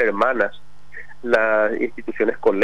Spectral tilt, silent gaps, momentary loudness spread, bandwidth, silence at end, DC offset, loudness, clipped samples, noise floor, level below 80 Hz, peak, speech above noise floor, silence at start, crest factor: -6 dB/octave; none; 21 LU; 10.5 kHz; 0 s; 3%; -20 LUFS; under 0.1%; -42 dBFS; -58 dBFS; -6 dBFS; 23 dB; 0 s; 14 dB